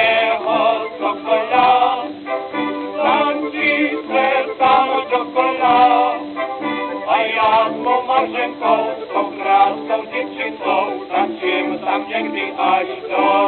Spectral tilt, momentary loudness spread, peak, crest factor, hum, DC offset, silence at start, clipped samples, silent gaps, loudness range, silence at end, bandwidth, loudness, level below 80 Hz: -7.5 dB/octave; 9 LU; -2 dBFS; 16 dB; none; under 0.1%; 0 s; under 0.1%; none; 3 LU; 0 s; 4.6 kHz; -17 LUFS; -62 dBFS